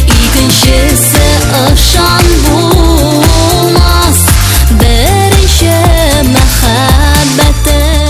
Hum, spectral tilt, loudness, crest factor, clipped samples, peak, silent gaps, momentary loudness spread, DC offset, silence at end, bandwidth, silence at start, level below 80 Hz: none; -4 dB/octave; -6 LUFS; 6 dB; 4%; 0 dBFS; none; 2 LU; 0.4%; 0 s; 15.5 kHz; 0 s; -10 dBFS